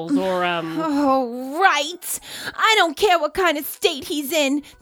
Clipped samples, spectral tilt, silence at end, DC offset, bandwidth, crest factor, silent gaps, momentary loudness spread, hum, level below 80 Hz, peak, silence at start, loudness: under 0.1%; -2.5 dB/octave; 0.1 s; under 0.1%; over 20 kHz; 20 dB; none; 10 LU; none; -56 dBFS; -2 dBFS; 0 s; -20 LUFS